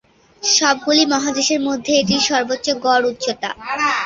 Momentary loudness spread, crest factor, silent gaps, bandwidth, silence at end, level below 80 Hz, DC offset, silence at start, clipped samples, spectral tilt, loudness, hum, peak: 9 LU; 16 dB; none; 7.8 kHz; 0 s; -54 dBFS; under 0.1%; 0.4 s; under 0.1%; -2 dB/octave; -17 LUFS; none; -2 dBFS